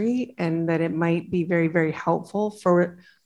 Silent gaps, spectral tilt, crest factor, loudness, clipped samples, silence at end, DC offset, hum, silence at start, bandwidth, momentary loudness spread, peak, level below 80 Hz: none; -8 dB/octave; 16 dB; -24 LUFS; under 0.1%; 0.3 s; under 0.1%; none; 0 s; 11 kHz; 5 LU; -8 dBFS; -62 dBFS